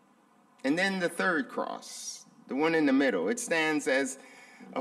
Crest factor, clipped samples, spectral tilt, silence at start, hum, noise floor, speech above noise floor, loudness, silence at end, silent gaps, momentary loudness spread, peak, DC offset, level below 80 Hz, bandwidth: 16 dB; under 0.1%; -3.5 dB/octave; 0.65 s; none; -63 dBFS; 34 dB; -29 LUFS; 0 s; none; 14 LU; -14 dBFS; under 0.1%; -82 dBFS; 14.5 kHz